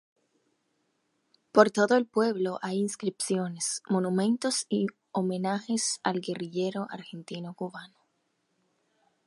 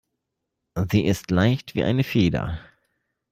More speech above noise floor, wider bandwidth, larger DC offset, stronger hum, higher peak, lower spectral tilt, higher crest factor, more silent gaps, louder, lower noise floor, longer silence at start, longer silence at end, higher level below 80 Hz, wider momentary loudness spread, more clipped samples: second, 47 dB vs 59 dB; second, 11.5 kHz vs 16 kHz; neither; neither; about the same, -4 dBFS vs -6 dBFS; second, -4.5 dB/octave vs -7 dB/octave; first, 26 dB vs 18 dB; neither; second, -28 LUFS vs -23 LUFS; second, -76 dBFS vs -81 dBFS; first, 1.55 s vs 0.75 s; first, 1.4 s vs 0.7 s; second, -80 dBFS vs -46 dBFS; first, 15 LU vs 11 LU; neither